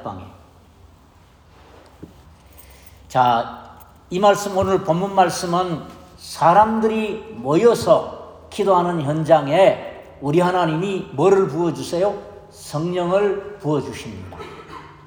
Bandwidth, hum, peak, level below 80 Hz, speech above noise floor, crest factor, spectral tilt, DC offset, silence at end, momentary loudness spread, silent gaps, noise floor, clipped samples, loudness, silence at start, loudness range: over 20 kHz; none; -2 dBFS; -52 dBFS; 32 dB; 18 dB; -6 dB/octave; under 0.1%; 0.15 s; 20 LU; none; -50 dBFS; under 0.1%; -19 LUFS; 0 s; 6 LU